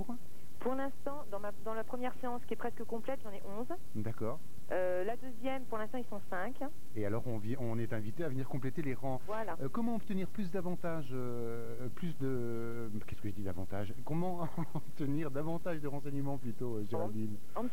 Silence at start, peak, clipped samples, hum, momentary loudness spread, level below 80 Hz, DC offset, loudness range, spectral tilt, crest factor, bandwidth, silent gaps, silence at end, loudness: 0 s; -22 dBFS; under 0.1%; none; 6 LU; -64 dBFS; 3%; 2 LU; -7.5 dB/octave; 16 dB; 16 kHz; none; 0 s; -40 LUFS